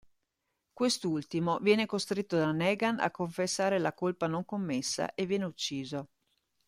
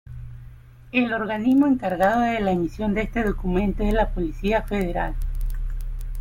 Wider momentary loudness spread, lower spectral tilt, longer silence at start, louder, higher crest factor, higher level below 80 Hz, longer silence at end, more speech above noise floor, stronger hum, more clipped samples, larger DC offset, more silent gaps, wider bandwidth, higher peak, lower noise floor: second, 6 LU vs 14 LU; second, -4.5 dB/octave vs -7.5 dB/octave; first, 0.75 s vs 0.05 s; second, -31 LUFS vs -23 LUFS; about the same, 20 dB vs 16 dB; second, -70 dBFS vs -30 dBFS; first, 0.6 s vs 0 s; first, 52 dB vs 22 dB; neither; neither; neither; neither; about the same, 15.5 kHz vs 16 kHz; second, -12 dBFS vs -6 dBFS; first, -83 dBFS vs -44 dBFS